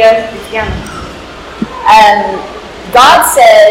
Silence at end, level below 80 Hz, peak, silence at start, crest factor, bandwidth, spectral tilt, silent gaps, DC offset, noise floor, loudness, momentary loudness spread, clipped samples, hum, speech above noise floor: 0 s; -32 dBFS; 0 dBFS; 0 s; 8 dB; 17.5 kHz; -2.5 dB/octave; none; under 0.1%; -26 dBFS; -7 LUFS; 21 LU; 5%; none; 20 dB